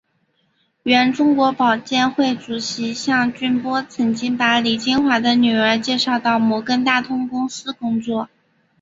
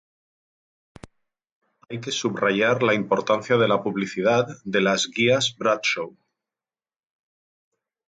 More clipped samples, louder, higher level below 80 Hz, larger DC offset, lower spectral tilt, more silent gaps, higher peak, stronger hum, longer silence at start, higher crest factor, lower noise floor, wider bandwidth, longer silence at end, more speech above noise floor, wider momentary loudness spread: neither; first, -18 LUFS vs -22 LUFS; about the same, -60 dBFS vs -64 dBFS; neither; about the same, -4 dB/octave vs -4 dB/octave; neither; first, -2 dBFS vs -6 dBFS; neither; second, 0.85 s vs 1.9 s; about the same, 18 dB vs 18 dB; second, -65 dBFS vs under -90 dBFS; second, 7.8 kHz vs 9.4 kHz; second, 0.55 s vs 2.05 s; second, 47 dB vs over 68 dB; about the same, 8 LU vs 8 LU